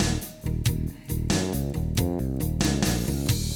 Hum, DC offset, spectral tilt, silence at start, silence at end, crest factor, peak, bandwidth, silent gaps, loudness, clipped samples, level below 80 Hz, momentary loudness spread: none; under 0.1%; -5 dB/octave; 0 s; 0 s; 16 dB; -10 dBFS; over 20 kHz; none; -27 LUFS; under 0.1%; -34 dBFS; 7 LU